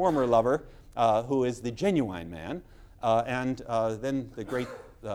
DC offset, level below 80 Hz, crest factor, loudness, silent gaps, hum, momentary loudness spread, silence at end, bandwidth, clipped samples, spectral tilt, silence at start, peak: under 0.1%; -52 dBFS; 18 dB; -28 LUFS; none; none; 14 LU; 0 s; 15.5 kHz; under 0.1%; -6.5 dB/octave; 0 s; -10 dBFS